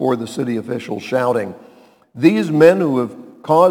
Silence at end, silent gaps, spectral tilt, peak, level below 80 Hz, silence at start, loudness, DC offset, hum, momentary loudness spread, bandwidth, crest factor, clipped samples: 0 s; none; -7 dB/octave; 0 dBFS; -66 dBFS; 0 s; -17 LUFS; under 0.1%; none; 13 LU; 17 kHz; 16 dB; under 0.1%